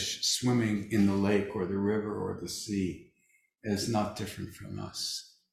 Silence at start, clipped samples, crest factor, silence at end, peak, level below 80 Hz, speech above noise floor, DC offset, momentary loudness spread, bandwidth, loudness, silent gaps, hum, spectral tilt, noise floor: 0 s; under 0.1%; 18 dB; 0.25 s; -14 dBFS; -56 dBFS; 39 dB; under 0.1%; 13 LU; 16 kHz; -31 LUFS; none; none; -4.5 dB/octave; -70 dBFS